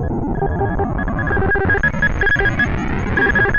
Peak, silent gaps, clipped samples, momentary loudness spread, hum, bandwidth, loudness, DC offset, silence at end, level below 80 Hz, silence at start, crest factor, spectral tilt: -6 dBFS; none; under 0.1%; 6 LU; none; 7 kHz; -17 LUFS; under 0.1%; 0 s; -26 dBFS; 0 s; 10 dB; -7 dB/octave